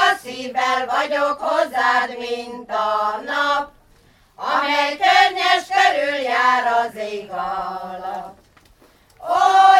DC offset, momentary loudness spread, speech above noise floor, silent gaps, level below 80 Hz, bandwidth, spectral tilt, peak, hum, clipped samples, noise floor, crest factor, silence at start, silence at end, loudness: under 0.1%; 14 LU; 34 dB; none; -60 dBFS; 14.5 kHz; -1.5 dB/octave; 0 dBFS; none; under 0.1%; -53 dBFS; 18 dB; 0 s; 0 s; -19 LUFS